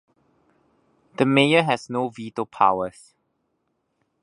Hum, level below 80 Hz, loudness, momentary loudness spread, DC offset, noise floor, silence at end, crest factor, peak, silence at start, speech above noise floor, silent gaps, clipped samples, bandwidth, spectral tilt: none; -66 dBFS; -21 LUFS; 14 LU; under 0.1%; -73 dBFS; 1.35 s; 24 dB; 0 dBFS; 1.2 s; 52 dB; none; under 0.1%; 11 kHz; -5.5 dB/octave